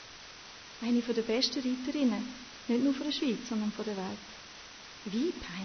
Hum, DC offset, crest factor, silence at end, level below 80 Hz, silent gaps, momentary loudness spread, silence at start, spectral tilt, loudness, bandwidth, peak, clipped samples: none; under 0.1%; 18 dB; 0 s; -64 dBFS; none; 17 LU; 0 s; -4.5 dB/octave; -33 LUFS; 6.6 kHz; -16 dBFS; under 0.1%